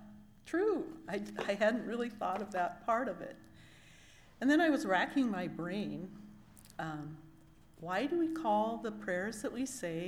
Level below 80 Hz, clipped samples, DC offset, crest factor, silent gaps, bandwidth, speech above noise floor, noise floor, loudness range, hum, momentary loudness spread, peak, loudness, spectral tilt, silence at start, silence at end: -68 dBFS; under 0.1%; under 0.1%; 18 dB; none; 16 kHz; 25 dB; -60 dBFS; 4 LU; none; 18 LU; -18 dBFS; -35 LUFS; -5 dB/octave; 0 s; 0 s